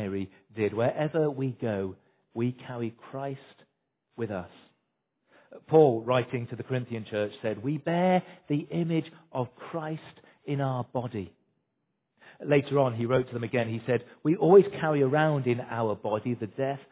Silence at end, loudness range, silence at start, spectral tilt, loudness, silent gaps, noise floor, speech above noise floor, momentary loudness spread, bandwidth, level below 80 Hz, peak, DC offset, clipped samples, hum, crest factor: 0.1 s; 10 LU; 0 s; -11.5 dB/octave; -28 LUFS; none; -79 dBFS; 52 dB; 15 LU; 4 kHz; -64 dBFS; -8 dBFS; under 0.1%; under 0.1%; none; 22 dB